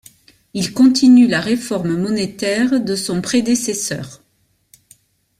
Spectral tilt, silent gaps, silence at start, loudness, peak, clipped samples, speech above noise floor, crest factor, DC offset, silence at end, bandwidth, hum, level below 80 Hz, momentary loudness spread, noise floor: -4.5 dB/octave; none; 0.55 s; -16 LUFS; -2 dBFS; under 0.1%; 47 dB; 14 dB; under 0.1%; 1.25 s; 14.5 kHz; none; -54 dBFS; 13 LU; -62 dBFS